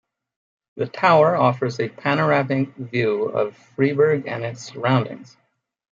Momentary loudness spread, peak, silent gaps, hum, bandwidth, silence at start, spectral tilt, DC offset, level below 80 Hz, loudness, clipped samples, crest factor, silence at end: 13 LU; -4 dBFS; none; none; 7.6 kHz; 0.75 s; -7 dB/octave; under 0.1%; -68 dBFS; -20 LUFS; under 0.1%; 18 dB; 0.7 s